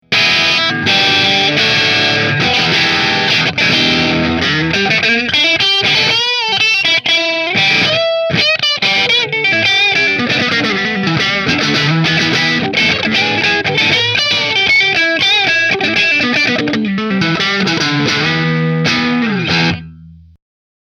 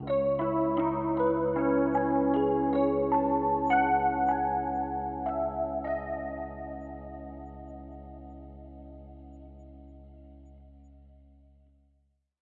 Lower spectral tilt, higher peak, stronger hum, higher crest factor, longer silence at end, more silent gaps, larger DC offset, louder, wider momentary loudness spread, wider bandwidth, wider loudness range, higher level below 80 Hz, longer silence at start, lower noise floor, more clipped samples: second, -3.5 dB/octave vs -10 dB/octave; first, 0 dBFS vs -14 dBFS; neither; about the same, 12 dB vs 16 dB; second, 0.7 s vs 1.6 s; neither; neither; first, -11 LUFS vs -28 LUFS; second, 4 LU vs 22 LU; first, 15 kHz vs 4.2 kHz; second, 3 LU vs 22 LU; about the same, -46 dBFS vs -50 dBFS; about the same, 0.1 s vs 0 s; second, -37 dBFS vs -71 dBFS; neither